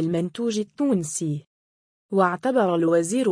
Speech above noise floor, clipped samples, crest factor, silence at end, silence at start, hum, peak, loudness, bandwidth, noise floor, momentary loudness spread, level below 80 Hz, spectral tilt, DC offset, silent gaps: over 68 dB; under 0.1%; 18 dB; 0 s; 0 s; none; -6 dBFS; -23 LUFS; 10.5 kHz; under -90 dBFS; 7 LU; -70 dBFS; -5.5 dB/octave; under 0.1%; 1.46-2.09 s